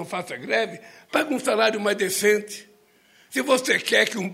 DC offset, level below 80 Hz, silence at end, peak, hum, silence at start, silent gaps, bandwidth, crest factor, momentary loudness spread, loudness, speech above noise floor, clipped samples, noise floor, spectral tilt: under 0.1%; -74 dBFS; 0 s; -4 dBFS; none; 0 s; none; 16 kHz; 20 dB; 11 LU; -22 LUFS; 34 dB; under 0.1%; -57 dBFS; -2.5 dB/octave